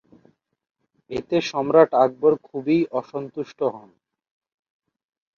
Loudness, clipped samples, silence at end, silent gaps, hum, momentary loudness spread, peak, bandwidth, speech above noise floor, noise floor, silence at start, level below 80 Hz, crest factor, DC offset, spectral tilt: -22 LUFS; under 0.1%; 1.6 s; none; none; 15 LU; -4 dBFS; 7 kHz; 39 dB; -60 dBFS; 1.1 s; -64 dBFS; 20 dB; under 0.1%; -6.5 dB/octave